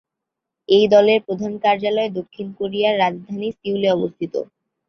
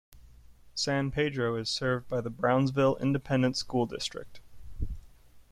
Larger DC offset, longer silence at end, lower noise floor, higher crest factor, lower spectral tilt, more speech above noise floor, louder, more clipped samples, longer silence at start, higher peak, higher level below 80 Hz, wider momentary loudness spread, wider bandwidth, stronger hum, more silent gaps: neither; first, 0.45 s vs 0.1 s; first, -83 dBFS vs -54 dBFS; about the same, 18 dB vs 18 dB; about the same, -6 dB/octave vs -5.5 dB/octave; first, 64 dB vs 25 dB; first, -19 LUFS vs -29 LUFS; neither; first, 0.7 s vs 0.1 s; first, -2 dBFS vs -12 dBFS; second, -64 dBFS vs -46 dBFS; about the same, 14 LU vs 14 LU; second, 6.4 kHz vs 13.5 kHz; neither; neither